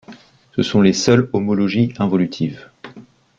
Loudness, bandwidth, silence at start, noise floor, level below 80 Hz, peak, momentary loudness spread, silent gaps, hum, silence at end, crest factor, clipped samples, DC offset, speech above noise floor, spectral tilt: -17 LUFS; 7.6 kHz; 0.1 s; -43 dBFS; -52 dBFS; -2 dBFS; 12 LU; none; none; 0.35 s; 16 dB; under 0.1%; under 0.1%; 27 dB; -6 dB/octave